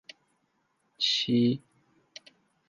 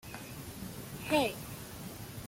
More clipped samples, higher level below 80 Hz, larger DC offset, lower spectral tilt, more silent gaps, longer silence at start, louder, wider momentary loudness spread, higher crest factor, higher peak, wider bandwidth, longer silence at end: neither; second, -76 dBFS vs -58 dBFS; neither; about the same, -5 dB/octave vs -4.5 dB/octave; neither; first, 1 s vs 0.05 s; first, -27 LUFS vs -37 LUFS; first, 25 LU vs 14 LU; about the same, 20 dB vs 22 dB; about the same, -14 dBFS vs -16 dBFS; second, 7.6 kHz vs 17 kHz; first, 1.1 s vs 0 s